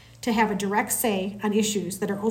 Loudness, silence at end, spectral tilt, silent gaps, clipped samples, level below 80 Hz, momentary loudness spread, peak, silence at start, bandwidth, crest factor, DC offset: -25 LUFS; 0 s; -4 dB/octave; none; under 0.1%; -58 dBFS; 4 LU; -10 dBFS; 0.1 s; 16.5 kHz; 16 dB; under 0.1%